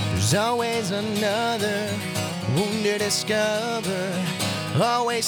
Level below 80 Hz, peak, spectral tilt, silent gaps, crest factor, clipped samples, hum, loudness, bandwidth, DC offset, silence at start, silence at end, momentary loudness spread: -60 dBFS; -8 dBFS; -4 dB/octave; none; 16 dB; under 0.1%; none; -24 LUFS; 19.5 kHz; under 0.1%; 0 s; 0 s; 5 LU